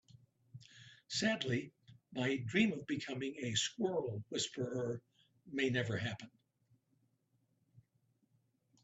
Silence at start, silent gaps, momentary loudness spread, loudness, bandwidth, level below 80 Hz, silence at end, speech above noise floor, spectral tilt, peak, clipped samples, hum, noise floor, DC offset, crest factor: 0.15 s; none; 21 LU; -38 LUFS; 8.2 kHz; -76 dBFS; 1.05 s; 41 dB; -4 dB/octave; -20 dBFS; under 0.1%; none; -79 dBFS; under 0.1%; 20 dB